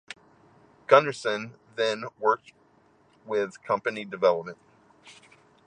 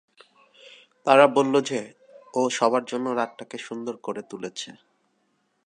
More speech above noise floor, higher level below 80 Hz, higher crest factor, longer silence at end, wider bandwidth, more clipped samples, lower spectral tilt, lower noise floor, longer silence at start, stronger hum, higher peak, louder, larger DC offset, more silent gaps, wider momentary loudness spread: second, 36 dB vs 47 dB; about the same, -76 dBFS vs -80 dBFS; about the same, 26 dB vs 24 dB; second, 0.55 s vs 0.95 s; about the same, 10 kHz vs 10.5 kHz; neither; about the same, -4.5 dB/octave vs -4 dB/octave; second, -62 dBFS vs -71 dBFS; second, 0.1 s vs 1.05 s; neither; about the same, -2 dBFS vs -2 dBFS; about the same, -26 LUFS vs -24 LUFS; neither; neither; first, 21 LU vs 18 LU